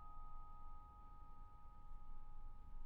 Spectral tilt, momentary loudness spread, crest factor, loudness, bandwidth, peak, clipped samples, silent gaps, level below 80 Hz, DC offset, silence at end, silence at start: -7 dB/octave; 4 LU; 10 dB; -62 LUFS; 2.6 kHz; -40 dBFS; under 0.1%; none; -54 dBFS; under 0.1%; 0 s; 0 s